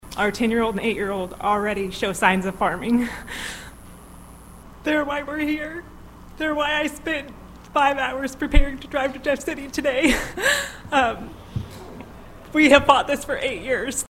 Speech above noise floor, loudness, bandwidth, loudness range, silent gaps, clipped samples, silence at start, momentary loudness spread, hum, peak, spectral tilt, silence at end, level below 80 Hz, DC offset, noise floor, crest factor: 21 dB; -22 LUFS; 16 kHz; 6 LU; none; under 0.1%; 0.05 s; 14 LU; none; 0 dBFS; -4 dB/octave; 0.05 s; -32 dBFS; under 0.1%; -43 dBFS; 22 dB